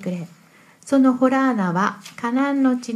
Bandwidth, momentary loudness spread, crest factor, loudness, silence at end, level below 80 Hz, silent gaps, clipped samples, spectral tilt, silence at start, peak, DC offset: 11 kHz; 13 LU; 16 dB; -20 LUFS; 0 s; -72 dBFS; none; under 0.1%; -6.5 dB/octave; 0 s; -4 dBFS; under 0.1%